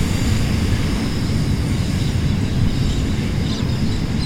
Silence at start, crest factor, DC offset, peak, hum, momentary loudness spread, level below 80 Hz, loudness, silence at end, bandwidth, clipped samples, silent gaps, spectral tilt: 0 s; 12 dB; under 0.1%; -6 dBFS; none; 2 LU; -26 dBFS; -20 LUFS; 0 s; 16.5 kHz; under 0.1%; none; -6 dB/octave